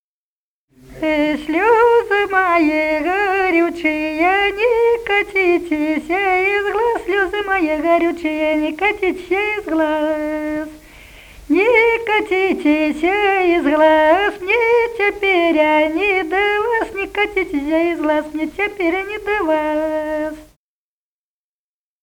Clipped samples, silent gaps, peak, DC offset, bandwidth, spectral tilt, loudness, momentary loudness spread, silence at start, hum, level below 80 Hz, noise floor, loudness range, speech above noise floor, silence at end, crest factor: under 0.1%; none; 0 dBFS; under 0.1%; 19 kHz; -4.5 dB/octave; -16 LUFS; 7 LU; 0.9 s; none; -46 dBFS; under -90 dBFS; 5 LU; over 74 dB; 1.6 s; 16 dB